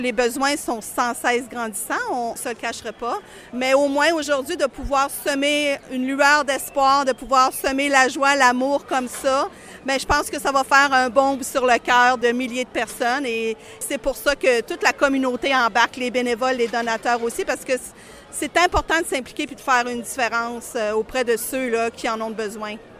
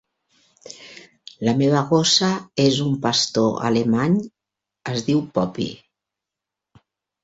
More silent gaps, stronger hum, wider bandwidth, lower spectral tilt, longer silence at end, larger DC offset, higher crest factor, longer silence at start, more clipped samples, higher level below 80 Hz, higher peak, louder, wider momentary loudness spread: neither; neither; first, 15.5 kHz vs 8 kHz; second, -2.5 dB/octave vs -4.5 dB/octave; second, 0 s vs 1.5 s; neither; about the same, 20 dB vs 18 dB; second, 0 s vs 0.65 s; neither; first, -46 dBFS vs -58 dBFS; first, 0 dBFS vs -4 dBFS; about the same, -20 LUFS vs -20 LUFS; second, 11 LU vs 22 LU